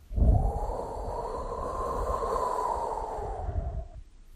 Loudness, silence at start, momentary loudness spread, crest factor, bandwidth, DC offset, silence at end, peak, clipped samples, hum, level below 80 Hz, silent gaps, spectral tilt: -32 LUFS; 0 s; 9 LU; 18 dB; 13.5 kHz; under 0.1%; 0 s; -12 dBFS; under 0.1%; none; -32 dBFS; none; -7.5 dB/octave